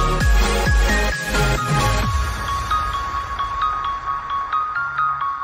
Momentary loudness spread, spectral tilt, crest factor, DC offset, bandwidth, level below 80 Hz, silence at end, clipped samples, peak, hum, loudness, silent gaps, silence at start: 6 LU; -4.5 dB/octave; 12 dB; under 0.1%; 16 kHz; -24 dBFS; 0 s; under 0.1%; -6 dBFS; none; -20 LUFS; none; 0 s